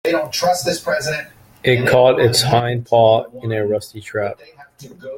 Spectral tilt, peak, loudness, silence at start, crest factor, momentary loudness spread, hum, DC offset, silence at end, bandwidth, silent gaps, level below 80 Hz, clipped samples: -4.5 dB/octave; -2 dBFS; -17 LUFS; 0.05 s; 16 dB; 14 LU; none; under 0.1%; 0 s; 17 kHz; none; -52 dBFS; under 0.1%